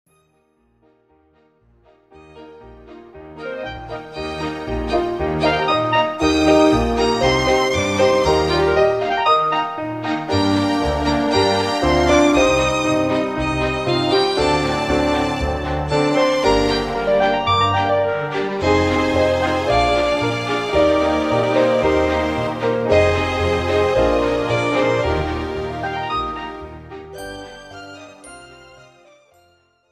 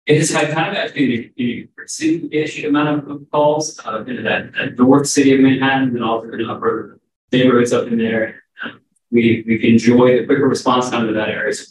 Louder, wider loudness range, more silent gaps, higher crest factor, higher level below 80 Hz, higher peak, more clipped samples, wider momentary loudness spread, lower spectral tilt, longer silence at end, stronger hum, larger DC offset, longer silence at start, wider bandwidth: about the same, -18 LUFS vs -16 LUFS; first, 12 LU vs 4 LU; second, none vs 7.16-7.28 s; about the same, 16 dB vs 16 dB; first, -34 dBFS vs -62 dBFS; about the same, -2 dBFS vs 0 dBFS; neither; first, 14 LU vs 11 LU; about the same, -5 dB/octave vs -5 dB/octave; first, 1.35 s vs 0.05 s; neither; neither; first, 2.15 s vs 0.05 s; about the same, 13.5 kHz vs 12.5 kHz